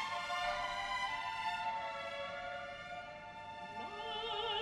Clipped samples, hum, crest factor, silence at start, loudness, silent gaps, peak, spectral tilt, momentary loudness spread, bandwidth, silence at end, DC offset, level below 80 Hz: under 0.1%; none; 16 dB; 0 s; -41 LUFS; none; -26 dBFS; -2 dB/octave; 10 LU; 13 kHz; 0 s; under 0.1%; -66 dBFS